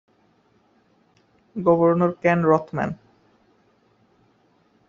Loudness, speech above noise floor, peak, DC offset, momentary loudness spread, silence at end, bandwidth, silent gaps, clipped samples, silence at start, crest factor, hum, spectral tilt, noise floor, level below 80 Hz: -20 LUFS; 42 dB; -4 dBFS; under 0.1%; 14 LU; 1.95 s; 7 kHz; none; under 0.1%; 1.55 s; 22 dB; none; -8 dB/octave; -62 dBFS; -62 dBFS